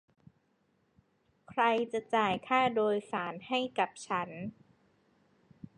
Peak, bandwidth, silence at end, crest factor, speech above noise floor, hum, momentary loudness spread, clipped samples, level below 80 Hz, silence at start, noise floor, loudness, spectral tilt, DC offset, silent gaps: -16 dBFS; 10.5 kHz; 1.25 s; 18 dB; 42 dB; none; 10 LU; under 0.1%; -74 dBFS; 1.5 s; -74 dBFS; -32 LUFS; -4.5 dB/octave; under 0.1%; none